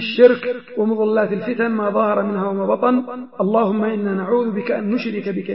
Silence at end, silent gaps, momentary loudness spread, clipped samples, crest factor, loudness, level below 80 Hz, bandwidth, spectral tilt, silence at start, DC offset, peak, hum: 0 s; none; 7 LU; under 0.1%; 18 dB; -19 LUFS; -74 dBFS; 5.8 kHz; -10.5 dB/octave; 0 s; 0.3%; 0 dBFS; none